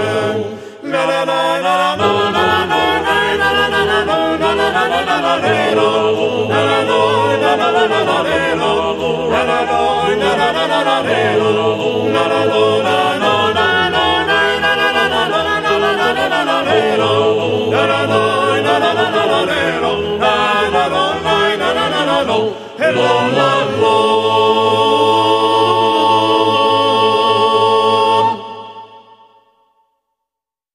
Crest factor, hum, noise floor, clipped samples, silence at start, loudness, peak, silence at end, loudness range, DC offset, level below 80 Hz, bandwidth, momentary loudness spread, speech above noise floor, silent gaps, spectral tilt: 14 dB; none; -84 dBFS; under 0.1%; 0 s; -13 LUFS; 0 dBFS; 1.75 s; 2 LU; under 0.1%; -46 dBFS; 14.5 kHz; 4 LU; 70 dB; none; -4.5 dB/octave